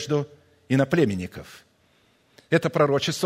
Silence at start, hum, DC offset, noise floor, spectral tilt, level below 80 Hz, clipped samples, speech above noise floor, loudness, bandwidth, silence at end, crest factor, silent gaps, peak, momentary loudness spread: 0 s; none; under 0.1%; -62 dBFS; -5.5 dB/octave; -60 dBFS; under 0.1%; 39 dB; -23 LUFS; 16 kHz; 0 s; 20 dB; none; -4 dBFS; 16 LU